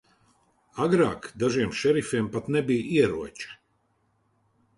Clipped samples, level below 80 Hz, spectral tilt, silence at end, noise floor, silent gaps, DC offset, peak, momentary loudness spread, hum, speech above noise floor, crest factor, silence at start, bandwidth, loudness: under 0.1%; -58 dBFS; -6 dB/octave; 1.25 s; -70 dBFS; none; under 0.1%; -8 dBFS; 15 LU; none; 45 dB; 18 dB; 0.75 s; 11.5 kHz; -25 LUFS